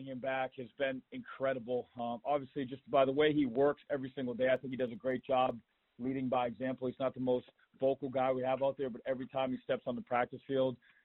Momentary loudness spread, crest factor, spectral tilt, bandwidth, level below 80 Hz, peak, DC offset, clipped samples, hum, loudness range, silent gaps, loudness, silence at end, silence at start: 9 LU; 20 dB; -4.5 dB/octave; 4 kHz; -72 dBFS; -16 dBFS; under 0.1%; under 0.1%; none; 3 LU; none; -35 LUFS; 0.3 s; 0 s